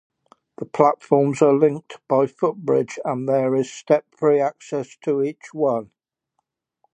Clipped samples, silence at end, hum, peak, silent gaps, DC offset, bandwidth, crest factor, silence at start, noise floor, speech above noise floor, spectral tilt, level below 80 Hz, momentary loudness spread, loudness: under 0.1%; 1.1 s; none; 0 dBFS; none; under 0.1%; 9.4 kHz; 20 dB; 0.6 s; -76 dBFS; 56 dB; -7 dB/octave; -72 dBFS; 11 LU; -21 LUFS